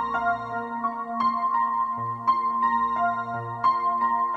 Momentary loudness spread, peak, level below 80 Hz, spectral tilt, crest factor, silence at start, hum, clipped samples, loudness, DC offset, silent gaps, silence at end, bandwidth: 6 LU; -10 dBFS; -60 dBFS; -7 dB/octave; 14 dB; 0 s; none; under 0.1%; -25 LUFS; under 0.1%; none; 0 s; 6.8 kHz